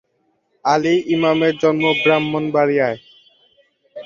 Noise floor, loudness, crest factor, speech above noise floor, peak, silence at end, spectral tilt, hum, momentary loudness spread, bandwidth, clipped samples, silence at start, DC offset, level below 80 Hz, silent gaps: -66 dBFS; -17 LUFS; 16 dB; 49 dB; -2 dBFS; 0 s; -6 dB/octave; none; 5 LU; 7.4 kHz; under 0.1%; 0.65 s; under 0.1%; -60 dBFS; none